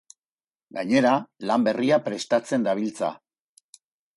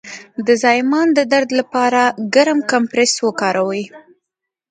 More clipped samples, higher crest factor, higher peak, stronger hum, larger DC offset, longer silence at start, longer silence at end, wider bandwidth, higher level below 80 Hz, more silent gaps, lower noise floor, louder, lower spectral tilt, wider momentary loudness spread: neither; about the same, 18 dB vs 16 dB; second, -8 dBFS vs 0 dBFS; neither; neither; first, 0.75 s vs 0.05 s; first, 1 s vs 0.7 s; first, 11.5 kHz vs 9.6 kHz; second, -72 dBFS vs -66 dBFS; neither; first, under -90 dBFS vs -81 dBFS; second, -24 LUFS vs -15 LUFS; first, -5.5 dB/octave vs -3 dB/octave; about the same, 10 LU vs 8 LU